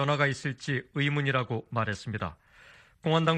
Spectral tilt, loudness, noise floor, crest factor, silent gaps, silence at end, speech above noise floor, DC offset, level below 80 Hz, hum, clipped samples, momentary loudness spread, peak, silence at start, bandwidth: -6 dB/octave; -30 LUFS; -56 dBFS; 20 dB; none; 0 s; 27 dB; under 0.1%; -60 dBFS; none; under 0.1%; 9 LU; -10 dBFS; 0 s; 9.4 kHz